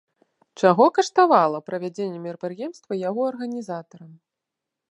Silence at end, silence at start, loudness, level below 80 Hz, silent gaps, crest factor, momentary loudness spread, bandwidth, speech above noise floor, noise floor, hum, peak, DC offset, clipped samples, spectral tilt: 0.8 s; 0.6 s; -22 LUFS; -80 dBFS; none; 22 dB; 15 LU; 10.5 kHz; 63 dB; -85 dBFS; none; -2 dBFS; under 0.1%; under 0.1%; -5.5 dB/octave